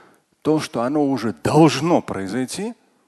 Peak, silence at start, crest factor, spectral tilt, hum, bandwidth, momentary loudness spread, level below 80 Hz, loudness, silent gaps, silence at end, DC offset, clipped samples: 0 dBFS; 0.45 s; 20 dB; -6 dB/octave; none; 12.5 kHz; 12 LU; -54 dBFS; -20 LUFS; none; 0.35 s; under 0.1%; under 0.1%